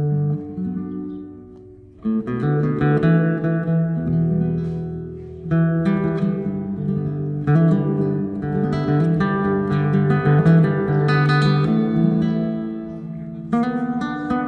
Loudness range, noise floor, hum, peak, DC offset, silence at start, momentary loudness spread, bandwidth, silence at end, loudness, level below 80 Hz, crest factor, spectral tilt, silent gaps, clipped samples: 4 LU; -42 dBFS; none; -4 dBFS; under 0.1%; 0 s; 13 LU; 5.6 kHz; 0 s; -20 LUFS; -46 dBFS; 16 dB; -9.5 dB/octave; none; under 0.1%